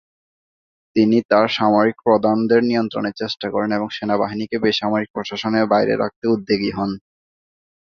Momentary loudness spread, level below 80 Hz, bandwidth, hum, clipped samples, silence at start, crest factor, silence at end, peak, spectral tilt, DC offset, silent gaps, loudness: 8 LU; -58 dBFS; 6.8 kHz; none; under 0.1%; 0.95 s; 18 dB; 0.85 s; -2 dBFS; -6.5 dB/octave; under 0.1%; 1.25-1.29 s, 5.10-5.14 s, 6.16-6.22 s; -19 LUFS